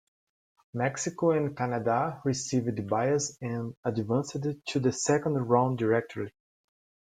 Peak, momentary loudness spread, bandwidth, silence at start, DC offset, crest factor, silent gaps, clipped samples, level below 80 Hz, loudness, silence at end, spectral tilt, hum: -8 dBFS; 8 LU; 9.6 kHz; 0.75 s; under 0.1%; 20 dB; 3.77-3.83 s; under 0.1%; -66 dBFS; -29 LUFS; 0.8 s; -5.5 dB/octave; none